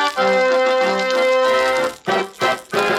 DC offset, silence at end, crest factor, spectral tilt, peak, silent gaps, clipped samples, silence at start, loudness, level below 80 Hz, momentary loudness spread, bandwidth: under 0.1%; 0 s; 14 dB; -3 dB/octave; -4 dBFS; none; under 0.1%; 0 s; -17 LUFS; -58 dBFS; 5 LU; 14.5 kHz